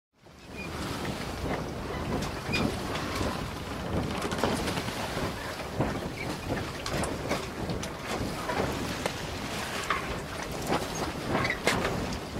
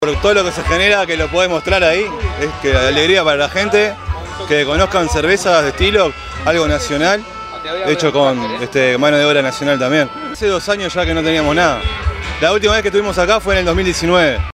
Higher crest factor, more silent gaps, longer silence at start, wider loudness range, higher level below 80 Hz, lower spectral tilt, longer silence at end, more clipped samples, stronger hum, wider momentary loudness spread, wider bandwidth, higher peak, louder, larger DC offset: first, 26 dB vs 14 dB; neither; first, 0.25 s vs 0 s; about the same, 2 LU vs 2 LU; second, -44 dBFS vs -30 dBFS; about the same, -4.5 dB/octave vs -4 dB/octave; about the same, 0 s vs 0 s; neither; neither; about the same, 6 LU vs 8 LU; about the same, 16 kHz vs 15 kHz; second, -6 dBFS vs 0 dBFS; second, -32 LUFS vs -14 LUFS; neither